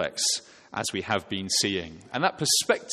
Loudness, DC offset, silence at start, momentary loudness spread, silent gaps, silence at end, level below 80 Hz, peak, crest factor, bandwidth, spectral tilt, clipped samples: -26 LUFS; under 0.1%; 0 s; 10 LU; none; 0 s; -62 dBFS; -6 dBFS; 22 dB; 13.5 kHz; -2 dB/octave; under 0.1%